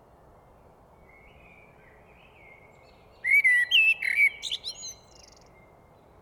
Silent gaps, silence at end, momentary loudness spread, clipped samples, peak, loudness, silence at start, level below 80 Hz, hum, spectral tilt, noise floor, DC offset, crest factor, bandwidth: none; 1.3 s; 18 LU; under 0.1%; -12 dBFS; -21 LUFS; 3.25 s; -64 dBFS; none; 1 dB/octave; -56 dBFS; under 0.1%; 18 dB; 19 kHz